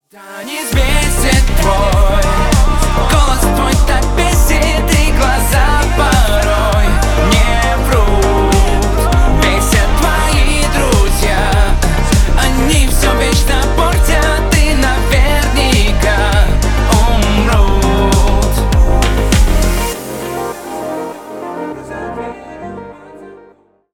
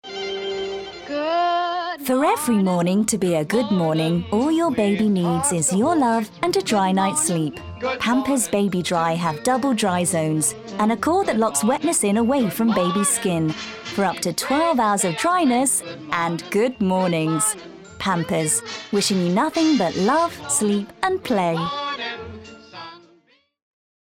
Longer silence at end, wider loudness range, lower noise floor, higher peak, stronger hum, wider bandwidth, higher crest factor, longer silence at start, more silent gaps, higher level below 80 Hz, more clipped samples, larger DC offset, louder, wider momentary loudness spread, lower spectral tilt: second, 0.6 s vs 1.2 s; about the same, 4 LU vs 2 LU; second, -46 dBFS vs -59 dBFS; first, 0 dBFS vs -4 dBFS; neither; about the same, 18 kHz vs 17.5 kHz; second, 10 dB vs 16 dB; first, 0.2 s vs 0.05 s; neither; first, -12 dBFS vs -58 dBFS; neither; neither; first, -12 LUFS vs -21 LUFS; first, 12 LU vs 8 LU; about the same, -4.5 dB/octave vs -4 dB/octave